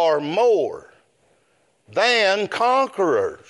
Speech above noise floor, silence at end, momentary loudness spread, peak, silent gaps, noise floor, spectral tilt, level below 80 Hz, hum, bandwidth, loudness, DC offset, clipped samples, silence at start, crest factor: 44 dB; 0.15 s; 10 LU; -4 dBFS; none; -63 dBFS; -3.5 dB/octave; -70 dBFS; none; 11.5 kHz; -19 LUFS; under 0.1%; under 0.1%; 0 s; 16 dB